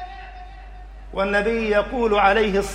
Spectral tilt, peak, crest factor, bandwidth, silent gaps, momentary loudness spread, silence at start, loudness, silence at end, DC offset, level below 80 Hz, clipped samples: -5 dB/octave; -4 dBFS; 18 dB; 15.5 kHz; none; 23 LU; 0 s; -19 LUFS; 0 s; under 0.1%; -38 dBFS; under 0.1%